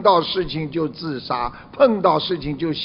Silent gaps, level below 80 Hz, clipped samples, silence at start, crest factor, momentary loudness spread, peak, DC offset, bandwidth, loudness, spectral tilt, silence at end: none; -46 dBFS; under 0.1%; 0 s; 18 dB; 9 LU; -2 dBFS; under 0.1%; 5.8 kHz; -21 LUFS; -9 dB/octave; 0 s